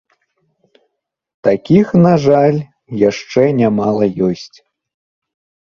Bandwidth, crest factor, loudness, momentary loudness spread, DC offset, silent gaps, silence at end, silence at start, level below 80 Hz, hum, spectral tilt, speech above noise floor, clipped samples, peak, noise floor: 7.2 kHz; 16 dB; -13 LUFS; 8 LU; under 0.1%; none; 1.3 s; 1.45 s; -52 dBFS; none; -8 dB/octave; 60 dB; under 0.1%; 0 dBFS; -72 dBFS